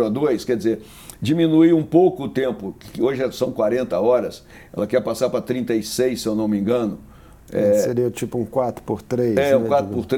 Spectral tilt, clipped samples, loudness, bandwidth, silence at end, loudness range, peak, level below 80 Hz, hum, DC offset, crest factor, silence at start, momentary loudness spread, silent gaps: -6.5 dB/octave; under 0.1%; -20 LUFS; 18 kHz; 0 s; 3 LU; -2 dBFS; -52 dBFS; none; under 0.1%; 18 dB; 0 s; 12 LU; none